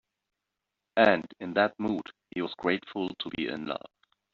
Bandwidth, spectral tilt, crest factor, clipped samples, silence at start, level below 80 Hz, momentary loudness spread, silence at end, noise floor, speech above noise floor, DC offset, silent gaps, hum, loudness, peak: 7.2 kHz; -3 dB/octave; 24 dB; under 0.1%; 0.95 s; -68 dBFS; 12 LU; 0.55 s; -86 dBFS; 57 dB; under 0.1%; none; none; -29 LUFS; -8 dBFS